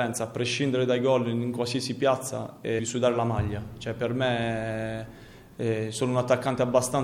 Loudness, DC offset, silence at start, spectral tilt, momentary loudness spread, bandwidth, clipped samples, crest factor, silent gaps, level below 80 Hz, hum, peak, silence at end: -27 LUFS; under 0.1%; 0 s; -5 dB/octave; 10 LU; 16 kHz; under 0.1%; 20 dB; none; -54 dBFS; none; -8 dBFS; 0 s